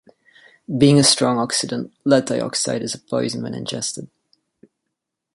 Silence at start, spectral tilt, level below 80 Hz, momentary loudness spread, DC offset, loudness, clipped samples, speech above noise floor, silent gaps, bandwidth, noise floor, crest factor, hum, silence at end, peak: 0.7 s; -4 dB/octave; -58 dBFS; 13 LU; under 0.1%; -19 LUFS; under 0.1%; 61 dB; none; 11.5 kHz; -80 dBFS; 20 dB; none; 1.3 s; 0 dBFS